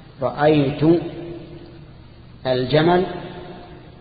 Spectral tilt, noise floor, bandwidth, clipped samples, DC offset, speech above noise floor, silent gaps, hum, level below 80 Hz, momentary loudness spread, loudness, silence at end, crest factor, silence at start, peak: -12 dB/octave; -42 dBFS; 4.9 kHz; under 0.1%; under 0.1%; 25 dB; none; none; -46 dBFS; 21 LU; -19 LUFS; 0.05 s; 18 dB; 0 s; -4 dBFS